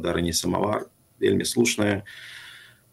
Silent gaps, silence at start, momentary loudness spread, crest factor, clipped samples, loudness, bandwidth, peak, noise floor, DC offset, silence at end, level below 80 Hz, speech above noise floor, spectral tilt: none; 0 s; 19 LU; 20 dB; under 0.1%; -24 LUFS; 16 kHz; -6 dBFS; -48 dBFS; under 0.1%; 0.3 s; -50 dBFS; 23 dB; -4 dB/octave